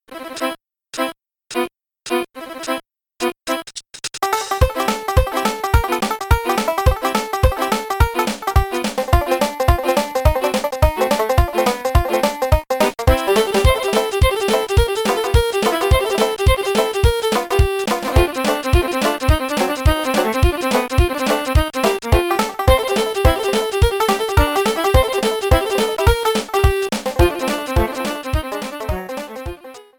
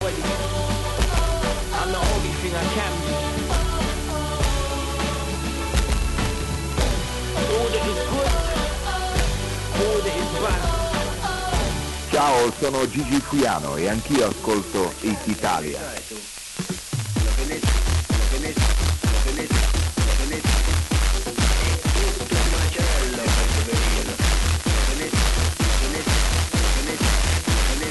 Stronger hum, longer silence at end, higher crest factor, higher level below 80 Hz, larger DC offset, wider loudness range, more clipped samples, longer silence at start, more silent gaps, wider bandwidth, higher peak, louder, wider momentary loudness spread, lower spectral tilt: neither; first, 0.15 s vs 0 s; about the same, 16 dB vs 14 dB; about the same, -24 dBFS vs -24 dBFS; neither; about the same, 5 LU vs 3 LU; neither; about the same, 0.1 s vs 0 s; neither; first, 19 kHz vs 12 kHz; first, -2 dBFS vs -8 dBFS; first, -18 LUFS vs -23 LUFS; first, 9 LU vs 5 LU; about the same, -5 dB/octave vs -4 dB/octave